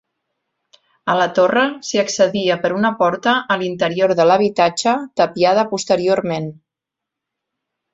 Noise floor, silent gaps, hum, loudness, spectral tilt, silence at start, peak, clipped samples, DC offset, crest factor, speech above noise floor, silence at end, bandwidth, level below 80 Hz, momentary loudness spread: -84 dBFS; none; none; -17 LUFS; -4 dB/octave; 1.05 s; -2 dBFS; under 0.1%; under 0.1%; 16 dB; 68 dB; 1.4 s; 8 kHz; -62 dBFS; 6 LU